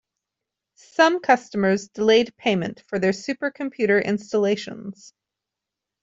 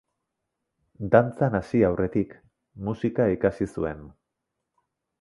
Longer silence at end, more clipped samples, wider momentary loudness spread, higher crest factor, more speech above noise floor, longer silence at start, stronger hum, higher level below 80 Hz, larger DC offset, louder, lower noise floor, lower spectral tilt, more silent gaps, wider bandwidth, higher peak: about the same, 1.1 s vs 1.1 s; neither; second, 10 LU vs 14 LU; about the same, 20 dB vs 24 dB; first, 64 dB vs 58 dB; about the same, 1 s vs 1 s; neither; second, -64 dBFS vs -50 dBFS; neither; first, -22 LUFS vs -25 LUFS; first, -86 dBFS vs -82 dBFS; second, -5 dB/octave vs -9 dB/octave; neither; second, 7.8 kHz vs 11.5 kHz; about the same, -4 dBFS vs -4 dBFS